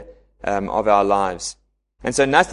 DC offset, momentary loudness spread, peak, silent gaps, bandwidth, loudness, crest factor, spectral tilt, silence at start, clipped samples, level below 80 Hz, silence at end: under 0.1%; 13 LU; 0 dBFS; none; 11.5 kHz; -20 LUFS; 20 dB; -3.5 dB/octave; 0 s; under 0.1%; -46 dBFS; 0 s